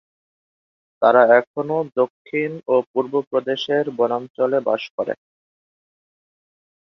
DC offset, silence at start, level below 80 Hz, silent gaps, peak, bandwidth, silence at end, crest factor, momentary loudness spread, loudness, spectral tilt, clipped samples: under 0.1%; 1 s; -72 dBFS; 1.47-1.54 s, 2.10-2.25 s, 2.87-2.94 s, 3.27-3.31 s, 4.30-4.34 s, 4.90-4.98 s; -2 dBFS; 6.4 kHz; 1.8 s; 20 dB; 10 LU; -20 LUFS; -6.5 dB/octave; under 0.1%